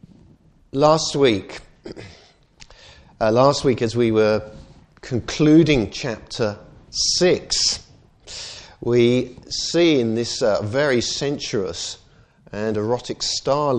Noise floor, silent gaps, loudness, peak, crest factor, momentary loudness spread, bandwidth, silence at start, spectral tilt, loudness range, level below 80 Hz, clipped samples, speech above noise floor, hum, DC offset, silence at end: -52 dBFS; none; -20 LUFS; -2 dBFS; 20 dB; 18 LU; 10 kHz; 0.75 s; -4.5 dB/octave; 4 LU; -46 dBFS; under 0.1%; 33 dB; none; under 0.1%; 0 s